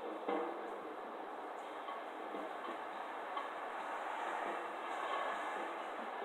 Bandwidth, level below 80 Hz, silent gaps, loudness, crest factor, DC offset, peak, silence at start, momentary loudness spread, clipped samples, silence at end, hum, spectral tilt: 16 kHz; -90 dBFS; none; -43 LUFS; 18 dB; under 0.1%; -24 dBFS; 0 s; 6 LU; under 0.1%; 0 s; none; -3.5 dB/octave